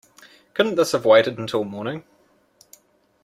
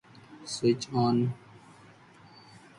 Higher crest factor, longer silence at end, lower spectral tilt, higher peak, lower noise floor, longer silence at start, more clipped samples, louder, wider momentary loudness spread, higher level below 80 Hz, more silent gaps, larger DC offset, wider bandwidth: about the same, 20 dB vs 18 dB; second, 1.25 s vs 1.4 s; second, -4.5 dB/octave vs -6 dB/octave; first, -4 dBFS vs -14 dBFS; about the same, -58 dBFS vs -55 dBFS; first, 0.55 s vs 0.3 s; neither; first, -20 LUFS vs -28 LUFS; second, 15 LU vs 18 LU; about the same, -66 dBFS vs -68 dBFS; neither; neither; first, 15 kHz vs 11.5 kHz